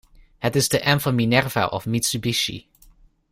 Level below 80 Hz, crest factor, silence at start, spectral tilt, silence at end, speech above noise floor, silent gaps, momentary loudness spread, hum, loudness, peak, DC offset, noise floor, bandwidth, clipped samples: -50 dBFS; 20 dB; 0.4 s; -4 dB/octave; 0.7 s; 32 dB; none; 7 LU; none; -21 LUFS; -4 dBFS; under 0.1%; -53 dBFS; 16 kHz; under 0.1%